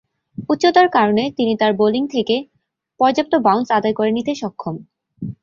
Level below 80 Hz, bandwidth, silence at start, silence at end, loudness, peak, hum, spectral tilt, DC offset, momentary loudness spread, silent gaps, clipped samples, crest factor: -58 dBFS; 7.4 kHz; 0.4 s; 0.1 s; -17 LUFS; -2 dBFS; none; -5.5 dB/octave; under 0.1%; 17 LU; none; under 0.1%; 16 dB